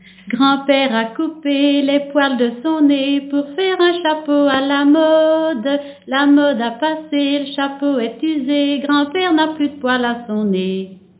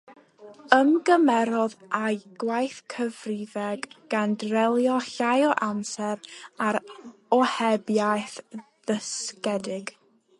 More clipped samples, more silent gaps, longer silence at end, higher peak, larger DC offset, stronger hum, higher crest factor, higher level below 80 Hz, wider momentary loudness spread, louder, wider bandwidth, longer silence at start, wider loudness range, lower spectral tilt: neither; neither; second, 0.25 s vs 0.5 s; about the same, -2 dBFS vs 0 dBFS; neither; first, 50 Hz at -60 dBFS vs none; second, 14 dB vs 26 dB; first, -64 dBFS vs -76 dBFS; second, 8 LU vs 15 LU; first, -16 LUFS vs -25 LUFS; second, 4 kHz vs 11.5 kHz; first, 0.25 s vs 0.1 s; about the same, 3 LU vs 3 LU; first, -9 dB/octave vs -4.5 dB/octave